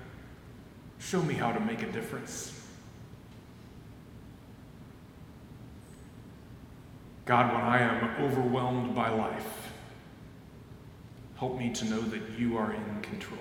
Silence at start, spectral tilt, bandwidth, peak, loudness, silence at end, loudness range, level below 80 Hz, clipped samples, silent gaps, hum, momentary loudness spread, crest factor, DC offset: 0 s; -5.5 dB/octave; 17 kHz; -8 dBFS; -31 LUFS; 0 s; 21 LU; -58 dBFS; under 0.1%; none; none; 23 LU; 28 dB; under 0.1%